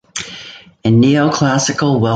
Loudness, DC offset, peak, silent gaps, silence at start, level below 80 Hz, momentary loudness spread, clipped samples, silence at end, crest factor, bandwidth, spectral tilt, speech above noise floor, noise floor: -13 LUFS; under 0.1%; -2 dBFS; none; 0.15 s; -48 dBFS; 18 LU; under 0.1%; 0 s; 12 dB; 9.4 kHz; -5.5 dB/octave; 24 dB; -36 dBFS